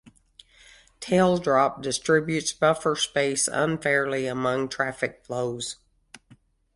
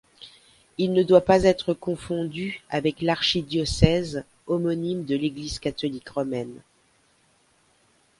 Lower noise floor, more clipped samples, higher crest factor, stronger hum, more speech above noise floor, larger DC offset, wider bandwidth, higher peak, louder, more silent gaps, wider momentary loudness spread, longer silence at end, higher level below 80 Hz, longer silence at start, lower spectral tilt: second, -58 dBFS vs -63 dBFS; neither; about the same, 20 dB vs 24 dB; neither; second, 33 dB vs 40 dB; neither; about the same, 11.5 kHz vs 11.5 kHz; second, -6 dBFS vs 0 dBFS; about the same, -24 LUFS vs -24 LUFS; neither; second, 9 LU vs 12 LU; second, 0.6 s vs 1.6 s; second, -60 dBFS vs -44 dBFS; first, 1 s vs 0.2 s; second, -4 dB/octave vs -6 dB/octave